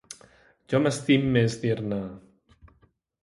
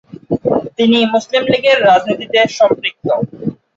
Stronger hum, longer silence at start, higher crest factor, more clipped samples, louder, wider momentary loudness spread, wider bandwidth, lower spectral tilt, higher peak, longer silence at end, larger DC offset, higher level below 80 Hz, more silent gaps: neither; second, 0.1 s vs 0.3 s; first, 20 dB vs 12 dB; neither; second, -25 LUFS vs -13 LUFS; first, 19 LU vs 8 LU; first, 11.5 kHz vs 7.8 kHz; about the same, -6 dB/octave vs -5 dB/octave; second, -8 dBFS vs 0 dBFS; first, 1.05 s vs 0.2 s; neither; about the same, -56 dBFS vs -52 dBFS; neither